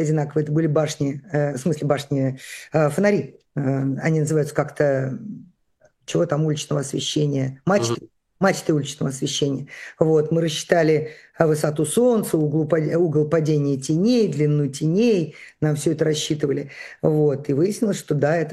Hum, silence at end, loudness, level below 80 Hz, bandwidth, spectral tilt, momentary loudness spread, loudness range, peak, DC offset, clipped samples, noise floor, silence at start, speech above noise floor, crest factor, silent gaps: none; 0 s; -21 LUFS; -62 dBFS; 13 kHz; -6 dB/octave; 8 LU; 4 LU; 0 dBFS; under 0.1%; under 0.1%; -60 dBFS; 0 s; 40 dB; 20 dB; none